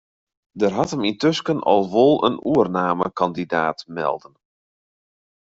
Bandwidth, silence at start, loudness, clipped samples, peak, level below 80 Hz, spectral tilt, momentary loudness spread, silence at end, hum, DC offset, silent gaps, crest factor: 8 kHz; 0.55 s; -20 LUFS; under 0.1%; -2 dBFS; -60 dBFS; -6 dB/octave; 9 LU; 1.4 s; none; under 0.1%; none; 18 dB